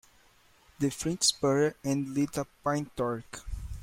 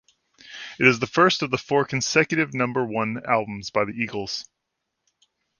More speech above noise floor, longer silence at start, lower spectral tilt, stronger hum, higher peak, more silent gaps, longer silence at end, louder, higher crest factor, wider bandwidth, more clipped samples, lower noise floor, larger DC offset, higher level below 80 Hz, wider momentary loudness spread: second, 32 dB vs 57 dB; first, 0.8 s vs 0.45 s; about the same, -4 dB/octave vs -4 dB/octave; neither; second, -12 dBFS vs -2 dBFS; neither; second, 0 s vs 1.15 s; second, -30 LUFS vs -22 LUFS; about the same, 20 dB vs 24 dB; first, 16.5 kHz vs 10 kHz; neither; second, -62 dBFS vs -80 dBFS; neither; first, -48 dBFS vs -60 dBFS; about the same, 13 LU vs 12 LU